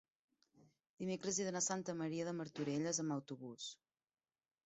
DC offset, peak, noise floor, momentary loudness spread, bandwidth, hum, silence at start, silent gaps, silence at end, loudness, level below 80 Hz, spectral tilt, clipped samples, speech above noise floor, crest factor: under 0.1%; -24 dBFS; -72 dBFS; 10 LU; 8.2 kHz; none; 0.6 s; 0.90-0.97 s; 0.95 s; -42 LUFS; -84 dBFS; -4 dB/octave; under 0.1%; 30 dB; 20 dB